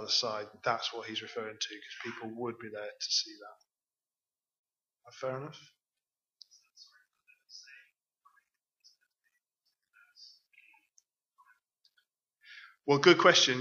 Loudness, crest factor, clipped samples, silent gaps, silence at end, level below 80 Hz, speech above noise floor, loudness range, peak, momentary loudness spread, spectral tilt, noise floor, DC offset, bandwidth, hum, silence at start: -30 LUFS; 28 dB; under 0.1%; 4.58-4.64 s; 0 s; -86 dBFS; over 59 dB; 25 LU; -6 dBFS; 29 LU; -3 dB/octave; under -90 dBFS; under 0.1%; 7.4 kHz; none; 0 s